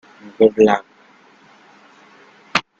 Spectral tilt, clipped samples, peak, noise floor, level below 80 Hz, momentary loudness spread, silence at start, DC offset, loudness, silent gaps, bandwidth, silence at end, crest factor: -5 dB/octave; under 0.1%; 0 dBFS; -50 dBFS; -62 dBFS; 9 LU; 0.4 s; under 0.1%; -16 LUFS; none; 7.8 kHz; 0.2 s; 20 dB